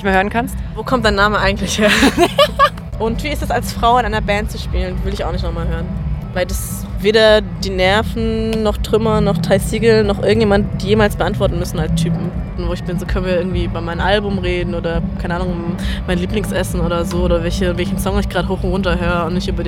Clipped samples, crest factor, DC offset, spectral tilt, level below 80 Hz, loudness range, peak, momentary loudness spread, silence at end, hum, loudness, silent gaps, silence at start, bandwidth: under 0.1%; 16 dB; under 0.1%; -5.5 dB/octave; -24 dBFS; 4 LU; 0 dBFS; 9 LU; 0 s; none; -16 LUFS; none; 0 s; 16.5 kHz